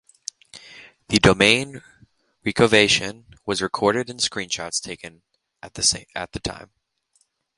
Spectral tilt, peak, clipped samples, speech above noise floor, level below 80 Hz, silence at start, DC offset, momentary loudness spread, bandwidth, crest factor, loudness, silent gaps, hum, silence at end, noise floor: -3 dB/octave; 0 dBFS; under 0.1%; 45 dB; -46 dBFS; 0.55 s; under 0.1%; 21 LU; 11.5 kHz; 24 dB; -20 LUFS; none; none; 0.95 s; -67 dBFS